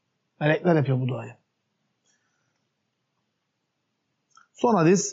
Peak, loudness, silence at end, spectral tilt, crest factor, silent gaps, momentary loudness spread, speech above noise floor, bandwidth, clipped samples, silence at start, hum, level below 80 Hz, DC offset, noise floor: -10 dBFS; -23 LUFS; 0 s; -6.5 dB/octave; 18 dB; none; 13 LU; 56 dB; 7.6 kHz; under 0.1%; 0.4 s; none; -76 dBFS; under 0.1%; -78 dBFS